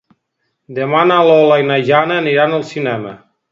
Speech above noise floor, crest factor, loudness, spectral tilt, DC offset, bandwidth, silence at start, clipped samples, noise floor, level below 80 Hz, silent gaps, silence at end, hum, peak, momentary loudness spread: 57 dB; 14 dB; -13 LUFS; -6.5 dB/octave; under 0.1%; 7.6 kHz; 0.7 s; under 0.1%; -70 dBFS; -64 dBFS; none; 0.35 s; none; 0 dBFS; 13 LU